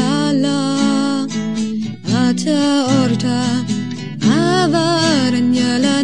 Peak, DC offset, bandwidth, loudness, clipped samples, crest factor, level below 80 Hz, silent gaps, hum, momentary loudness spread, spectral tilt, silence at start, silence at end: -2 dBFS; 0.9%; 11 kHz; -16 LUFS; under 0.1%; 12 dB; -60 dBFS; none; none; 7 LU; -5 dB/octave; 0 s; 0 s